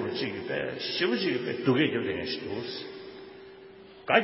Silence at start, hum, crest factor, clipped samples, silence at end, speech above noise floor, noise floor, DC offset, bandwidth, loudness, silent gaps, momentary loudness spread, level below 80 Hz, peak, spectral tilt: 0 s; none; 24 dB; under 0.1%; 0 s; 20 dB; -49 dBFS; under 0.1%; 5.8 kHz; -29 LUFS; none; 22 LU; -64 dBFS; -6 dBFS; -8.5 dB/octave